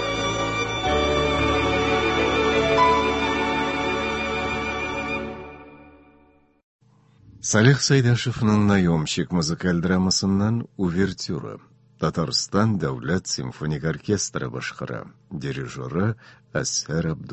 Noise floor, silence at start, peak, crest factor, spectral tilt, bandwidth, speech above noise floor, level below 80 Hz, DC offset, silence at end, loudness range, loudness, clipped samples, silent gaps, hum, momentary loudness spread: -57 dBFS; 0 s; -2 dBFS; 20 dB; -4.5 dB/octave; 8.4 kHz; 34 dB; -40 dBFS; under 0.1%; 0 s; 7 LU; -23 LUFS; under 0.1%; 6.63-6.79 s; none; 12 LU